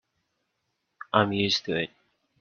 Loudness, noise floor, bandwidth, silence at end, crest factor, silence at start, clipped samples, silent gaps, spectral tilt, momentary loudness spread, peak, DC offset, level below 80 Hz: -26 LUFS; -78 dBFS; 7.2 kHz; 0.55 s; 26 dB; 1.15 s; under 0.1%; none; -4.5 dB/octave; 7 LU; -4 dBFS; under 0.1%; -68 dBFS